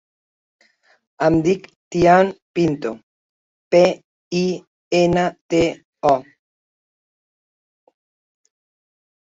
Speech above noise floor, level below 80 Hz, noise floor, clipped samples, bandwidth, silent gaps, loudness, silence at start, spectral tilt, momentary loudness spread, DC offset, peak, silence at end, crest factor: over 73 dB; -50 dBFS; under -90 dBFS; under 0.1%; 7.8 kHz; 1.76-1.91 s, 2.42-2.54 s, 3.03-3.71 s, 4.04-4.31 s, 4.67-4.91 s, 5.41-5.49 s, 5.85-5.93 s; -19 LUFS; 1.2 s; -6 dB/octave; 12 LU; under 0.1%; -2 dBFS; 3.15 s; 18 dB